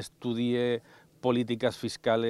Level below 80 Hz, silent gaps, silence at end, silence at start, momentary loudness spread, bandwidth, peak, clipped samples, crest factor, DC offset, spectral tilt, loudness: -68 dBFS; none; 0 s; 0 s; 6 LU; 13 kHz; -12 dBFS; under 0.1%; 16 dB; under 0.1%; -6 dB/octave; -30 LUFS